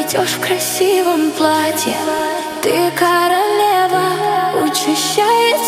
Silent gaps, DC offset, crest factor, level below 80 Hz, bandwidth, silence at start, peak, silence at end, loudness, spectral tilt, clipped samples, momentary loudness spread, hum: none; under 0.1%; 14 dB; -60 dBFS; 17 kHz; 0 s; 0 dBFS; 0 s; -14 LUFS; -2.5 dB/octave; under 0.1%; 4 LU; none